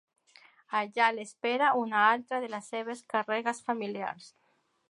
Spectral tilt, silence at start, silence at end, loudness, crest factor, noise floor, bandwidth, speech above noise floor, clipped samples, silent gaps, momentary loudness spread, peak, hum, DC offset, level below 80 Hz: -3.5 dB/octave; 0.7 s; 0.6 s; -30 LUFS; 20 dB; -72 dBFS; 11.5 kHz; 43 dB; under 0.1%; none; 12 LU; -10 dBFS; none; under 0.1%; -88 dBFS